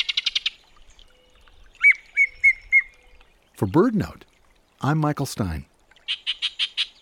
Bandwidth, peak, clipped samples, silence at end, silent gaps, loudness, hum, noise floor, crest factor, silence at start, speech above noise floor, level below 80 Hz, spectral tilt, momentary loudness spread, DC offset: 17.5 kHz; -6 dBFS; under 0.1%; 0.15 s; none; -21 LUFS; none; -59 dBFS; 18 dB; 0 s; 36 dB; -48 dBFS; -4.5 dB/octave; 13 LU; under 0.1%